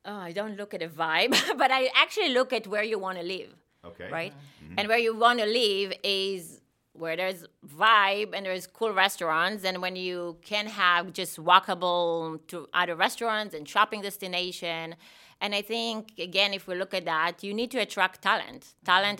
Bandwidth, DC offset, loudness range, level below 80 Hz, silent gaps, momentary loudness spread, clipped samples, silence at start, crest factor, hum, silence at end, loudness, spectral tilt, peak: 17 kHz; under 0.1%; 4 LU; -74 dBFS; none; 14 LU; under 0.1%; 0.05 s; 26 dB; none; 0 s; -27 LUFS; -2.5 dB/octave; -2 dBFS